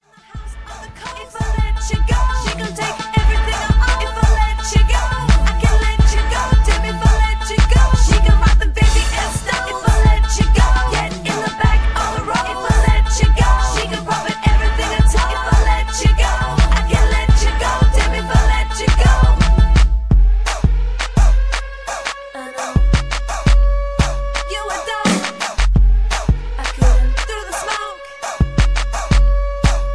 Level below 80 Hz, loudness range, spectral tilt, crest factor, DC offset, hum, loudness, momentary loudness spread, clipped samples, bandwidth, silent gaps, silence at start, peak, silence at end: -14 dBFS; 4 LU; -5 dB/octave; 14 dB; under 0.1%; none; -16 LUFS; 9 LU; under 0.1%; 11 kHz; none; 0.35 s; 0 dBFS; 0 s